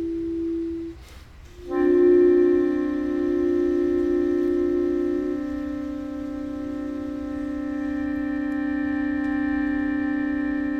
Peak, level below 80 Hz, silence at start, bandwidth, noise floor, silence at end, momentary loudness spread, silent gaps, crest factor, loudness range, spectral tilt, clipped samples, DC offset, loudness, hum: -8 dBFS; -46 dBFS; 0 s; 6.4 kHz; -44 dBFS; 0 s; 12 LU; none; 14 dB; 8 LU; -8 dB/octave; under 0.1%; under 0.1%; -24 LUFS; none